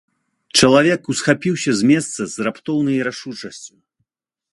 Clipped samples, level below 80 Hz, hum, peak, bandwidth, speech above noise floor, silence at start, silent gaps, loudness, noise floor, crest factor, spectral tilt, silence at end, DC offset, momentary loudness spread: under 0.1%; -54 dBFS; none; 0 dBFS; 11.5 kHz; 63 dB; 0.55 s; none; -17 LUFS; -81 dBFS; 18 dB; -4 dB/octave; 0.85 s; under 0.1%; 18 LU